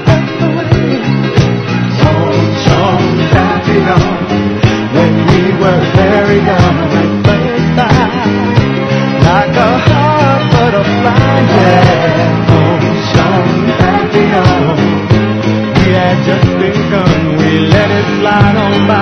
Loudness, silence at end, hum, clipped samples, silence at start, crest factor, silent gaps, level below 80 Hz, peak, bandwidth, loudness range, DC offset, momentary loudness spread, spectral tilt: -9 LUFS; 0 s; none; 1%; 0 s; 8 dB; none; -30 dBFS; 0 dBFS; 6.6 kHz; 2 LU; under 0.1%; 3 LU; -7 dB/octave